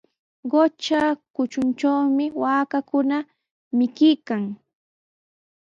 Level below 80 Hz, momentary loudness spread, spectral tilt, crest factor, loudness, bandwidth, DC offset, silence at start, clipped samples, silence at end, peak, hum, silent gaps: -68 dBFS; 9 LU; -5.5 dB/octave; 16 dB; -22 LUFS; 7.6 kHz; under 0.1%; 0.45 s; under 0.1%; 1.1 s; -6 dBFS; none; 1.30-1.34 s, 3.51-3.71 s